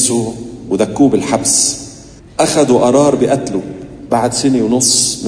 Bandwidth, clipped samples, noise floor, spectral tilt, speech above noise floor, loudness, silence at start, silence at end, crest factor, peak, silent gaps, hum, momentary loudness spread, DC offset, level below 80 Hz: 11 kHz; under 0.1%; -36 dBFS; -3.5 dB/octave; 23 dB; -12 LUFS; 0 s; 0 s; 14 dB; 0 dBFS; none; none; 15 LU; under 0.1%; -44 dBFS